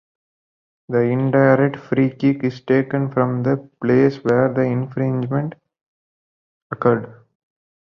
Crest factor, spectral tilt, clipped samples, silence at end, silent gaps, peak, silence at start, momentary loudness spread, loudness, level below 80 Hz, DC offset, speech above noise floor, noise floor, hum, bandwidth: 18 dB; -10 dB/octave; under 0.1%; 0.8 s; 5.81-6.70 s; -2 dBFS; 0.9 s; 8 LU; -19 LUFS; -58 dBFS; under 0.1%; over 72 dB; under -90 dBFS; none; 6.4 kHz